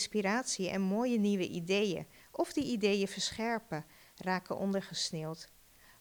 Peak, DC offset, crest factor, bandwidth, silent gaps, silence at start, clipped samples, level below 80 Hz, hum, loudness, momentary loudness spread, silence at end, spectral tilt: -18 dBFS; under 0.1%; 16 dB; over 20 kHz; none; 0 s; under 0.1%; -68 dBFS; none; -34 LUFS; 12 LU; 0.55 s; -4.5 dB/octave